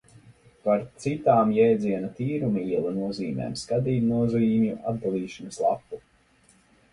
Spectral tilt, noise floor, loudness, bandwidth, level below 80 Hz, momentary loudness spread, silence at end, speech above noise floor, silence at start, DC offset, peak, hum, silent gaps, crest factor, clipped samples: -7.5 dB/octave; -61 dBFS; -25 LUFS; 11.5 kHz; -58 dBFS; 11 LU; 0.95 s; 36 dB; 0.3 s; under 0.1%; -6 dBFS; none; none; 18 dB; under 0.1%